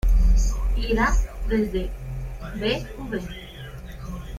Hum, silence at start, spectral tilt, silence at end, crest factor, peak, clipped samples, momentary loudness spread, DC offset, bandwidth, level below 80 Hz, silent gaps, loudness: none; 0.05 s; -5.5 dB/octave; 0 s; 16 dB; -8 dBFS; under 0.1%; 16 LU; under 0.1%; 13 kHz; -24 dBFS; none; -26 LUFS